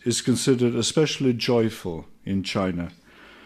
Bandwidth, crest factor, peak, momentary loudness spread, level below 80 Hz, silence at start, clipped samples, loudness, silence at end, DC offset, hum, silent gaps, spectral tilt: 15 kHz; 16 dB; -8 dBFS; 12 LU; -54 dBFS; 0.05 s; under 0.1%; -23 LUFS; 0.55 s; under 0.1%; none; none; -5 dB/octave